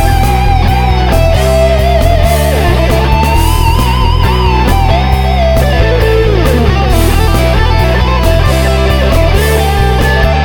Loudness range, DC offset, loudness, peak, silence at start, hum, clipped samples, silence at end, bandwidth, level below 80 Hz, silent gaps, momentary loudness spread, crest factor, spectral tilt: 0 LU; 2%; -9 LUFS; 0 dBFS; 0 s; none; 0.3%; 0 s; 18.5 kHz; -12 dBFS; none; 1 LU; 8 dB; -6 dB/octave